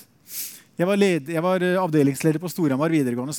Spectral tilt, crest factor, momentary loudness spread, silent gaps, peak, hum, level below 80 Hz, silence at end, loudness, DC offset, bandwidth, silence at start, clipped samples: -6 dB/octave; 16 dB; 12 LU; none; -6 dBFS; none; -72 dBFS; 0 s; -22 LUFS; under 0.1%; 18 kHz; 0.3 s; under 0.1%